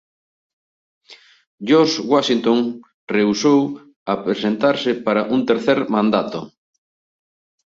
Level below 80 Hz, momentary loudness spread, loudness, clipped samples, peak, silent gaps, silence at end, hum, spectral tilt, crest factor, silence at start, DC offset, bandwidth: -62 dBFS; 11 LU; -18 LUFS; under 0.1%; -2 dBFS; 1.47-1.58 s, 2.94-3.07 s, 3.96-4.06 s; 1.15 s; none; -5 dB/octave; 18 dB; 1.1 s; under 0.1%; 7.8 kHz